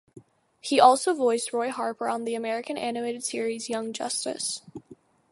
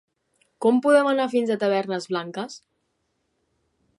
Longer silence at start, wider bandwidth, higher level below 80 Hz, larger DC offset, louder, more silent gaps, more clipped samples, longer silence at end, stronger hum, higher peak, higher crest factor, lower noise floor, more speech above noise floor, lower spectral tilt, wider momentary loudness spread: second, 0.15 s vs 0.6 s; about the same, 11.5 kHz vs 11.5 kHz; about the same, -76 dBFS vs -78 dBFS; neither; second, -26 LUFS vs -22 LUFS; neither; neither; second, 0.35 s vs 1.4 s; neither; about the same, -4 dBFS vs -6 dBFS; first, 24 dB vs 18 dB; second, -53 dBFS vs -73 dBFS; second, 28 dB vs 52 dB; second, -2.5 dB/octave vs -5 dB/octave; about the same, 12 LU vs 14 LU